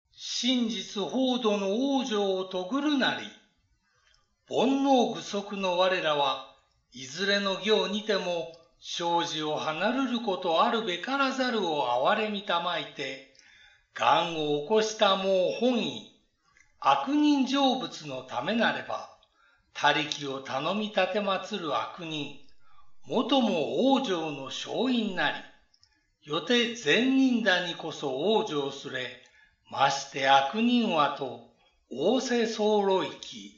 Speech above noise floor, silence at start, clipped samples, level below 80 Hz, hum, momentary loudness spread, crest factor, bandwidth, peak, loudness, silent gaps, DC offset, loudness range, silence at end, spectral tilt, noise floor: 43 dB; 0.2 s; under 0.1%; -74 dBFS; none; 11 LU; 20 dB; 7.8 kHz; -8 dBFS; -27 LUFS; none; under 0.1%; 3 LU; 0.1 s; -2 dB/octave; -70 dBFS